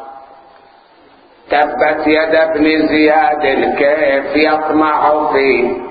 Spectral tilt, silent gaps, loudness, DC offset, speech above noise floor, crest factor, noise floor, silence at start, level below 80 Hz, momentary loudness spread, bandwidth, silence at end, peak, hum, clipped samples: -8.5 dB/octave; none; -12 LUFS; under 0.1%; 33 dB; 14 dB; -45 dBFS; 0 s; -46 dBFS; 3 LU; 5 kHz; 0 s; 0 dBFS; none; under 0.1%